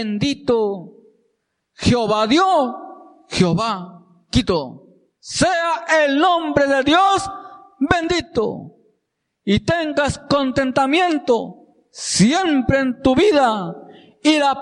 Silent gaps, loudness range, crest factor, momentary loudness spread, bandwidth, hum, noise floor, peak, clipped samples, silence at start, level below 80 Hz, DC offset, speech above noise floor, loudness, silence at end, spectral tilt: none; 3 LU; 18 dB; 14 LU; 11.5 kHz; none; -74 dBFS; 0 dBFS; under 0.1%; 0 s; -42 dBFS; under 0.1%; 56 dB; -18 LUFS; 0 s; -4.5 dB/octave